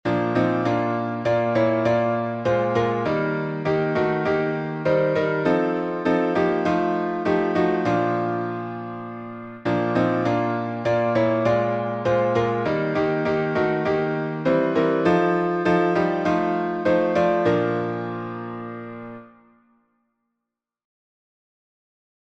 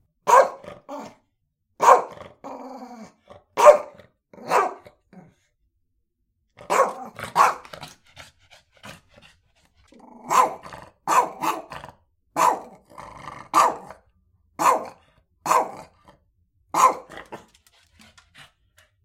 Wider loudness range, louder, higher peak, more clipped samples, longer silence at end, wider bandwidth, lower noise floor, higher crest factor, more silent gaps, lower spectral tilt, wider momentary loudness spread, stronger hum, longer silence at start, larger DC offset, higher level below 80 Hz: second, 3 LU vs 7 LU; about the same, -22 LUFS vs -20 LUFS; second, -8 dBFS vs 0 dBFS; neither; first, 2.95 s vs 1.7 s; second, 8 kHz vs 16.5 kHz; first, -84 dBFS vs -73 dBFS; second, 14 dB vs 24 dB; neither; first, -8 dB/octave vs -2.5 dB/octave; second, 10 LU vs 26 LU; neither; second, 0.05 s vs 0.25 s; neither; first, -56 dBFS vs -64 dBFS